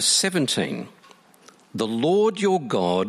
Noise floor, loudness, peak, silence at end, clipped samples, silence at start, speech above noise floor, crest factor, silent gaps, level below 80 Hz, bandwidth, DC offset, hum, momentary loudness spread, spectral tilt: -53 dBFS; -22 LUFS; -6 dBFS; 0 s; under 0.1%; 0 s; 31 dB; 16 dB; none; -68 dBFS; 15.5 kHz; under 0.1%; none; 14 LU; -3.5 dB/octave